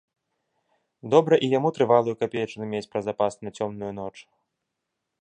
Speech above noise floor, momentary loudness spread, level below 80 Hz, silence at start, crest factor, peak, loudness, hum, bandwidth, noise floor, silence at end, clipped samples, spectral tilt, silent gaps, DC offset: 58 dB; 14 LU; -66 dBFS; 1.05 s; 22 dB; -4 dBFS; -24 LUFS; none; 9.6 kHz; -82 dBFS; 1 s; under 0.1%; -6.5 dB/octave; none; under 0.1%